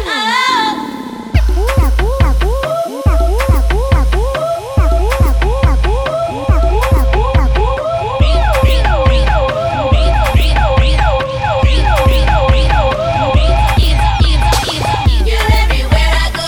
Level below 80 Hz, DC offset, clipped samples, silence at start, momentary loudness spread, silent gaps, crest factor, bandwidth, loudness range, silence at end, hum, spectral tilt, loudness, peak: -12 dBFS; under 0.1%; under 0.1%; 0 s; 4 LU; none; 10 dB; 19 kHz; 2 LU; 0 s; none; -5.5 dB/octave; -13 LUFS; 0 dBFS